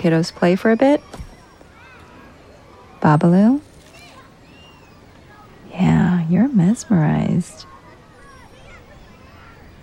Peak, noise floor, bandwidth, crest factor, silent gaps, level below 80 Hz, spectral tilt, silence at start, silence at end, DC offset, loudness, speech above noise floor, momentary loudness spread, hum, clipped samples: -2 dBFS; -45 dBFS; 11 kHz; 16 dB; none; -48 dBFS; -7.5 dB/octave; 0 s; 2.2 s; under 0.1%; -17 LUFS; 30 dB; 17 LU; none; under 0.1%